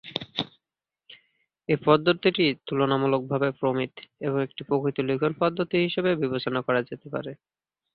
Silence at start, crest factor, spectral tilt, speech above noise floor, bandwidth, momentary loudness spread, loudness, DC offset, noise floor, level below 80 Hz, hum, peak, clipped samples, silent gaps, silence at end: 0.05 s; 20 dB; -8.5 dB/octave; 64 dB; 6 kHz; 12 LU; -26 LUFS; under 0.1%; -89 dBFS; -64 dBFS; none; -6 dBFS; under 0.1%; none; 0.6 s